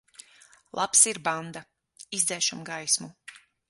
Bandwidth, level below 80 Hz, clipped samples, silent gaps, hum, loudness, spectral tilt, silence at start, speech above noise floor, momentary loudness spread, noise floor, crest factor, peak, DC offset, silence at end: 12 kHz; -74 dBFS; under 0.1%; none; none; -24 LUFS; -0.5 dB/octave; 0.75 s; 30 dB; 21 LU; -57 dBFS; 24 dB; -4 dBFS; under 0.1%; 0.35 s